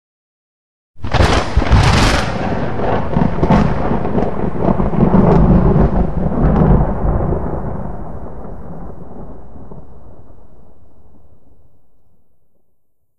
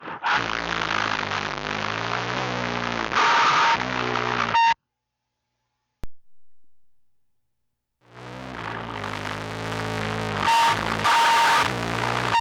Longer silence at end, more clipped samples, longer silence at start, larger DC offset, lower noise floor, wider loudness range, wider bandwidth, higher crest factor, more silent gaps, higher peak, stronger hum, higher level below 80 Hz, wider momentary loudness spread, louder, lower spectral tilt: about the same, 0 s vs 0 s; neither; first, 0.95 s vs 0 s; first, 7% vs under 0.1%; second, -61 dBFS vs -81 dBFS; first, 17 LU vs 14 LU; second, 12 kHz vs 19 kHz; about the same, 16 dB vs 12 dB; neither; first, 0 dBFS vs -12 dBFS; neither; first, -22 dBFS vs -50 dBFS; first, 21 LU vs 13 LU; first, -15 LUFS vs -22 LUFS; first, -7 dB/octave vs -3 dB/octave